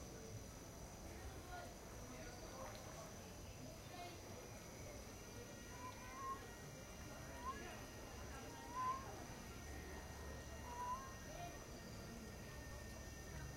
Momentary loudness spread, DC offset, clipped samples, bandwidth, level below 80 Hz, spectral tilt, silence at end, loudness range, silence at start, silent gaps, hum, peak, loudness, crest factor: 6 LU; under 0.1%; under 0.1%; 16 kHz; -60 dBFS; -4 dB/octave; 0 s; 4 LU; 0 s; none; none; -34 dBFS; -53 LUFS; 18 dB